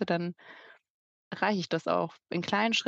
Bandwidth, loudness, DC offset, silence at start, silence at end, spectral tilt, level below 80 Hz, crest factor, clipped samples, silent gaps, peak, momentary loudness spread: 8 kHz; -31 LUFS; under 0.1%; 0 s; 0 s; -4.5 dB/octave; -78 dBFS; 22 dB; under 0.1%; 0.90-1.31 s; -10 dBFS; 20 LU